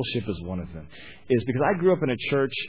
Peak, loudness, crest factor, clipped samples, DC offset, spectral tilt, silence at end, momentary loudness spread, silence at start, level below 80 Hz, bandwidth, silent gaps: -10 dBFS; -25 LUFS; 16 dB; under 0.1%; 0.4%; -10.5 dB/octave; 0 s; 19 LU; 0 s; -50 dBFS; 4 kHz; none